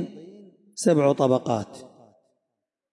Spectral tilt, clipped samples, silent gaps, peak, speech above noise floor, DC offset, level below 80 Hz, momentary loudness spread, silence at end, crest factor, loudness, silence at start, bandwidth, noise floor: -6 dB/octave; under 0.1%; none; -8 dBFS; 61 dB; under 0.1%; -72 dBFS; 21 LU; 1.05 s; 18 dB; -22 LUFS; 0 s; 11.5 kHz; -83 dBFS